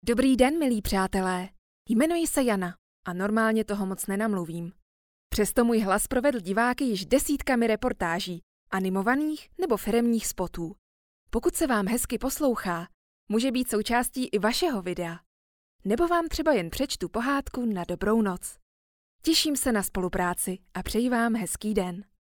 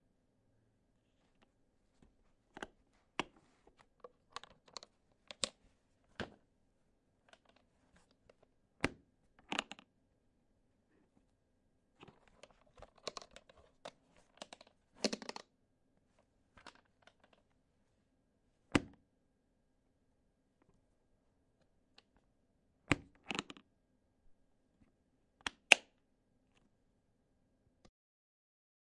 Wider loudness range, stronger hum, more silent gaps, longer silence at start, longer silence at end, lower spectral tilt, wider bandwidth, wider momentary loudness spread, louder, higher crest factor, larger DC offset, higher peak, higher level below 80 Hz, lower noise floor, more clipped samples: second, 3 LU vs 19 LU; neither; first, 1.58-1.85 s, 2.78-3.03 s, 4.82-5.30 s, 8.43-8.67 s, 10.78-11.27 s, 12.94-13.27 s, 15.26-15.79 s, 18.62-19.19 s vs none; second, 0.05 s vs 2.6 s; second, 0.2 s vs 3.1 s; first, -4 dB/octave vs -2.5 dB/octave; first, 19.5 kHz vs 11 kHz; second, 10 LU vs 20 LU; first, -27 LUFS vs -38 LUFS; second, 20 dB vs 44 dB; neither; second, -8 dBFS vs -2 dBFS; first, -46 dBFS vs -70 dBFS; first, under -90 dBFS vs -78 dBFS; neither